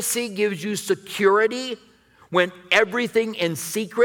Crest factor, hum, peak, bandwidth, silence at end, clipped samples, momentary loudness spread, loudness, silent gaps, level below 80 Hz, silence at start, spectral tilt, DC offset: 18 dB; none; -4 dBFS; 19.5 kHz; 0 s; under 0.1%; 9 LU; -22 LUFS; none; -68 dBFS; 0 s; -3 dB/octave; under 0.1%